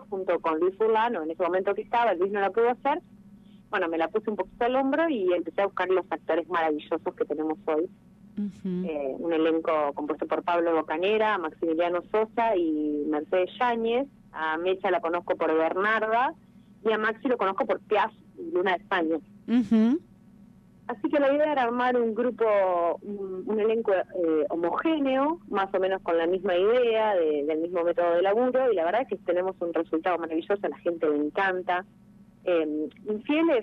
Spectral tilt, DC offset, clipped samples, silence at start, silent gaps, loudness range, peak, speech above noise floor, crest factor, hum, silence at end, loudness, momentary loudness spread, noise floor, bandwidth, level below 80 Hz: -7.5 dB/octave; under 0.1%; under 0.1%; 0 s; none; 3 LU; -12 dBFS; 28 dB; 14 dB; none; 0 s; -26 LUFS; 7 LU; -53 dBFS; 6.4 kHz; -66 dBFS